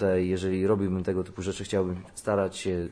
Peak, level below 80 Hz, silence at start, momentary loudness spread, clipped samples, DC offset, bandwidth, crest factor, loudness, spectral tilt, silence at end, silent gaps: -12 dBFS; -54 dBFS; 0 s; 7 LU; under 0.1%; under 0.1%; 11 kHz; 16 dB; -28 LUFS; -6.5 dB/octave; 0 s; none